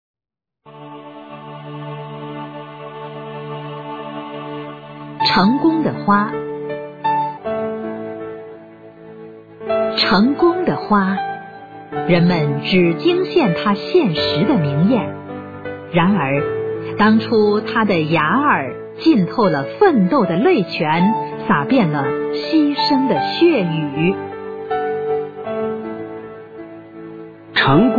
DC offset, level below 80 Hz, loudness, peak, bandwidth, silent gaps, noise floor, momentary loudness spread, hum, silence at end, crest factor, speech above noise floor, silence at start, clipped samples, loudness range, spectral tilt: under 0.1%; -52 dBFS; -17 LUFS; -2 dBFS; 5 kHz; none; -81 dBFS; 19 LU; none; 0 s; 16 dB; 66 dB; 0.65 s; under 0.1%; 10 LU; -8 dB/octave